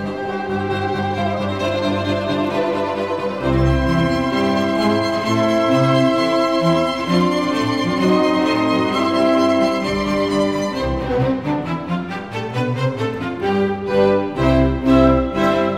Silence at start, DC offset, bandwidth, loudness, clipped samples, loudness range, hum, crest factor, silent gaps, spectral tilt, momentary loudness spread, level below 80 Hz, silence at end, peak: 0 s; 0.2%; 14.5 kHz; -18 LUFS; under 0.1%; 4 LU; none; 16 dB; none; -6.5 dB/octave; 7 LU; -34 dBFS; 0 s; -2 dBFS